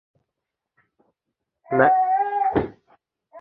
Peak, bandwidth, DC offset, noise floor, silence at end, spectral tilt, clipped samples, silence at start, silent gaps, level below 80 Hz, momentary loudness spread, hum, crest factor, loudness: -2 dBFS; 4.2 kHz; under 0.1%; -84 dBFS; 0 s; -10 dB/octave; under 0.1%; 1.7 s; none; -52 dBFS; 9 LU; none; 22 dB; -20 LUFS